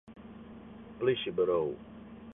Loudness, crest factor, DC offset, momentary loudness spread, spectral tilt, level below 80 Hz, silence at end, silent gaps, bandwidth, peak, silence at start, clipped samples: -31 LUFS; 18 dB; under 0.1%; 20 LU; -9 dB/octave; -62 dBFS; 0 s; none; 3.9 kHz; -16 dBFS; 0.05 s; under 0.1%